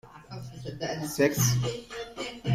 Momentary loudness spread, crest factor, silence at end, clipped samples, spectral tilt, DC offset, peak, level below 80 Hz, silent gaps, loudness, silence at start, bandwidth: 18 LU; 18 dB; 0 s; under 0.1%; -4.5 dB/octave; under 0.1%; -10 dBFS; -54 dBFS; none; -29 LUFS; 0.05 s; 16 kHz